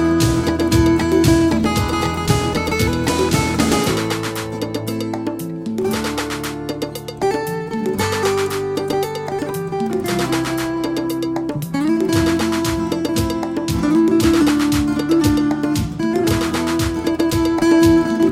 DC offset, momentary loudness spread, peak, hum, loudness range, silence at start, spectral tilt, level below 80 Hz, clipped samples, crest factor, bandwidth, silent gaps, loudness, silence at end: under 0.1%; 9 LU; -2 dBFS; none; 5 LU; 0 s; -5.5 dB/octave; -34 dBFS; under 0.1%; 16 dB; 16.5 kHz; none; -18 LUFS; 0 s